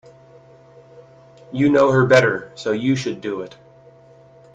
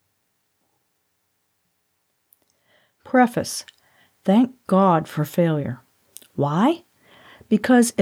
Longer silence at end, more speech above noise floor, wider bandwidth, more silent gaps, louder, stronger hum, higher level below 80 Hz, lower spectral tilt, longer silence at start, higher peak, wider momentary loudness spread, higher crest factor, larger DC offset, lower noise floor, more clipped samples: first, 1.05 s vs 0 s; second, 30 dB vs 53 dB; second, 8.6 kHz vs 16 kHz; neither; first, -18 LUFS vs -21 LUFS; neither; first, -58 dBFS vs -66 dBFS; about the same, -6.5 dB/octave vs -6 dB/octave; second, 1.5 s vs 3.1 s; first, 0 dBFS vs -4 dBFS; first, 16 LU vs 13 LU; about the same, 20 dB vs 18 dB; neither; second, -48 dBFS vs -71 dBFS; neither